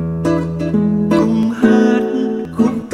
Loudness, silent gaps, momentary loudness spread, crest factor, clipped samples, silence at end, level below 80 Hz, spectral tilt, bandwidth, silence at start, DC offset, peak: -15 LUFS; none; 6 LU; 14 dB; under 0.1%; 0 s; -42 dBFS; -8 dB/octave; 10.5 kHz; 0 s; under 0.1%; 0 dBFS